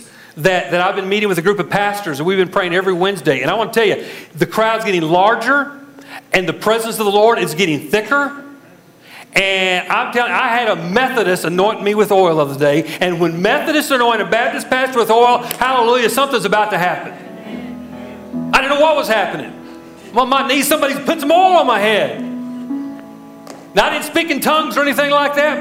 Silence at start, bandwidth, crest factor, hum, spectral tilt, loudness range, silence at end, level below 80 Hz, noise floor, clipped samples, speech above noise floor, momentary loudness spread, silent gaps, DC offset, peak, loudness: 0 s; 16 kHz; 16 dB; none; -4 dB/octave; 3 LU; 0 s; -52 dBFS; -44 dBFS; under 0.1%; 29 dB; 14 LU; none; under 0.1%; 0 dBFS; -15 LUFS